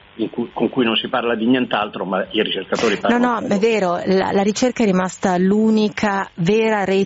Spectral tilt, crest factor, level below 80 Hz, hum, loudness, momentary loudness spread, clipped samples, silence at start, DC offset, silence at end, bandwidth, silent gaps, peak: -4 dB/octave; 12 dB; -54 dBFS; none; -18 LUFS; 5 LU; under 0.1%; 0.15 s; under 0.1%; 0 s; 8 kHz; none; -4 dBFS